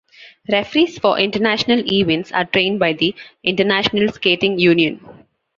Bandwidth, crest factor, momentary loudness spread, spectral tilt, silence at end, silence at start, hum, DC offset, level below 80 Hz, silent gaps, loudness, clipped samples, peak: 7.4 kHz; 16 dB; 6 LU; -5.5 dB/octave; 0.45 s; 0.2 s; none; under 0.1%; -54 dBFS; none; -16 LUFS; under 0.1%; -2 dBFS